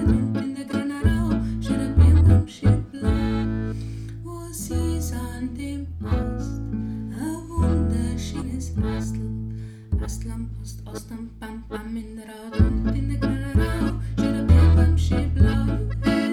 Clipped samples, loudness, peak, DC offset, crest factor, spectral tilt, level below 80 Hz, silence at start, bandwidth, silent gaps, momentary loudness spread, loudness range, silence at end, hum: under 0.1%; -23 LUFS; -4 dBFS; under 0.1%; 18 dB; -7.5 dB/octave; -28 dBFS; 0 s; 13 kHz; none; 16 LU; 9 LU; 0 s; none